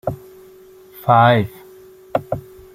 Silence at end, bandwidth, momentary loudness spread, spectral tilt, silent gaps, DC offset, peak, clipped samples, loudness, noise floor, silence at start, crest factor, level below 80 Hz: 0.35 s; 16 kHz; 17 LU; -7.5 dB/octave; none; under 0.1%; -2 dBFS; under 0.1%; -18 LUFS; -44 dBFS; 0.05 s; 18 dB; -50 dBFS